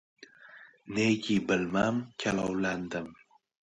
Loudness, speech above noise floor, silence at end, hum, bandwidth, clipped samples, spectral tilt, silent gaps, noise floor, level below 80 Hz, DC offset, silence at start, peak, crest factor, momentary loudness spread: -30 LUFS; 24 dB; 0.65 s; none; 10.5 kHz; under 0.1%; -5.5 dB/octave; none; -54 dBFS; -62 dBFS; under 0.1%; 0.2 s; -14 dBFS; 18 dB; 23 LU